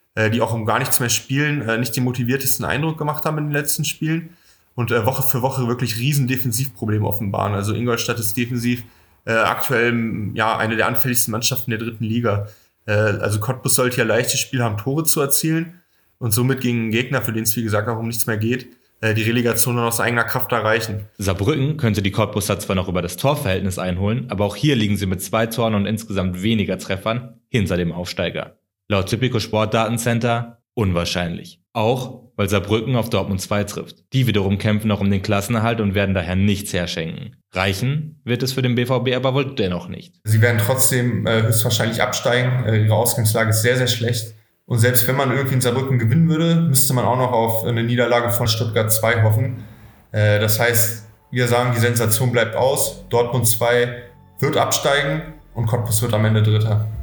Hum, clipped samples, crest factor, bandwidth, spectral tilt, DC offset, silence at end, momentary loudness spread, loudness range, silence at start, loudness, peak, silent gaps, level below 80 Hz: none; under 0.1%; 18 dB; over 20 kHz; -4.5 dB/octave; under 0.1%; 0 s; 8 LU; 4 LU; 0.15 s; -19 LUFS; 0 dBFS; none; -52 dBFS